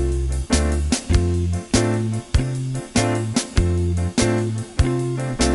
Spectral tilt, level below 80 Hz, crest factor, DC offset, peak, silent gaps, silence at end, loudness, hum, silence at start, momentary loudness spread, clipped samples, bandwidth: -5.5 dB/octave; -26 dBFS; 16 dB; under 0.1%; -4 dBFS; none; 0 s; -21 LUFS; none; 0 s; 4 LU; under 0.1%; 11.5 kHz